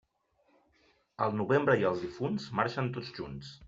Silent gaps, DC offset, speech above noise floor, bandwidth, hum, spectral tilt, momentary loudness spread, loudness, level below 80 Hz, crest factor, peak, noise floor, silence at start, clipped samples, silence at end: none; under 0.1%; 42 dB; 7.8 kHz; none; -5 dB/octave; 14 LU; -32 LUFS; -64 dBFS; 20 dB; -12 dBFS; -73 dBFS; 1.2 s; under 0.1%; 0 s